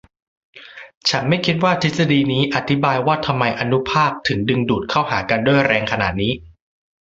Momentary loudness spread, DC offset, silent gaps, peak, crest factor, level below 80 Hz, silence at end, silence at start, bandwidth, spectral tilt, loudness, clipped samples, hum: 5 LU; under 0.1%; 0.97-1.01 s; -2 dBFS; 18 dB; -46 dBFS; 0.55 s; 0.55 s; 7.8 kHz; -5.5 dB/octave; -18 LUFS; under 0.1%; none